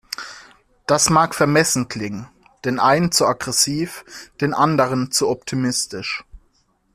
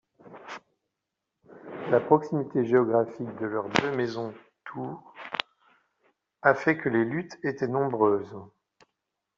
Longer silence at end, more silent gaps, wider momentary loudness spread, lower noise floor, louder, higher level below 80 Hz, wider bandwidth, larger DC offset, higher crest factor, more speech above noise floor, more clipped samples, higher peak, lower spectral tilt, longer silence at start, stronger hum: second, 0.55 s vs 0.9 s; neither; second, 15 LU vs 20 LU; second, -62 dBFS vs -85 dBFS; first, -19 LUFS vs -27 LUFS; first, -52 dBFS vs -70 dBFS; first, 16 kHz vs 7.6 kHz; neither; second, 18 dB vs 26 dB; second, 43 dB vs 59 dB; neither; about the same, -2 dBFS vs -2 dBFS; about the same, -3.5 dB/octave vs -4.5 dB/octave; second, 0.1 s vs 0.25 s; neither